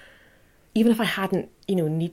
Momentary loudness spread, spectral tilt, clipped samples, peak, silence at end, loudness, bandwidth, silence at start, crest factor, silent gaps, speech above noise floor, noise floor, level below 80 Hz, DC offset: 8 LU; -6.5 dB/octave; under 0.1%; -8 dBFS; 0 s; -24 LUFS; 16.5 kHz; 0.75 s; 16 dB; none; 34 dB; -57 dBFS; -62 dBFS; under 0.1%